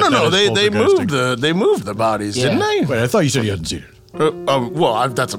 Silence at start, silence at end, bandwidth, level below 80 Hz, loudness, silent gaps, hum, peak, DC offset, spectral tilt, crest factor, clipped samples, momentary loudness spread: 0 s; 0 s; 17 kHz; -50 dBFS; -16 LUFS; none; none; -2 dBFS; under 0.1%; -4.5 dB/octave; 14 dB; under 0.1%; 7 LU